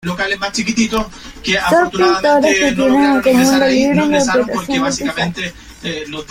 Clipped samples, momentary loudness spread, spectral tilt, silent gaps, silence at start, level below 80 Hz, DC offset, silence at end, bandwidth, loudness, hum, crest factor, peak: under 0.1%; 13 LU; -4 dB/octave; none; 0.05 s; -40 dBFS; under 0.1%; 0.05 s; 16.5 kHz; -14 LUFS; none; 14 dB; -2 dBFS